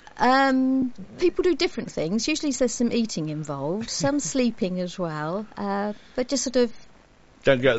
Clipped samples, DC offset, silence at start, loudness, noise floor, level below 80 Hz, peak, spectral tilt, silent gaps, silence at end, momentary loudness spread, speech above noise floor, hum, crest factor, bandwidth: under 0.1%; under 0.1%; 0.15 s; -25 LUFS; -53 dBFS; -50 dBFS; -6 dBFS; -4 dB/octave; none; 0 s; 9 LU; 30 dB; none; 18 dB; 8 kHz